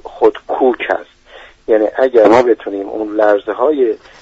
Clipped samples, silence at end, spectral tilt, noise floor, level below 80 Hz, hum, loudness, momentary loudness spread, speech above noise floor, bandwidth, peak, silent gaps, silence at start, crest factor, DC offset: under 0.1%; 0.25 s; -6 dB/octave; -40 dBFS; -50 dBFS; none; -14 LUFS; 11 LU; 27 dB; 8 kHz; 0 dBFS; none; 0.05 s; 14 dB; under 0.1%